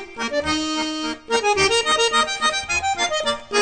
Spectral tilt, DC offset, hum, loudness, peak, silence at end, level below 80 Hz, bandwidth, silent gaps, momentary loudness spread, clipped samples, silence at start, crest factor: -1.5 dB/octave; under 0.1%; none; -20 LUFS; -6 dBFS; 0 s; -46 dBFS; 9.4 kHz; none; 7 LU; under 0.1%; 0 s; 16 dB